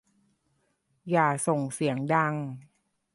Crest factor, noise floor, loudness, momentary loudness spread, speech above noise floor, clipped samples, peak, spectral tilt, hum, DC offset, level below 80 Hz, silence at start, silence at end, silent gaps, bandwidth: 20 dB; -73 dBFS; -27 LUFS; 16 LU; 46 dB; under 0.1%; -8 dBFS; -5.5 dB/octave; none; under 0.1%; -72 dBFS; 1.05 s; 0.55 s; none; 11.5 kHz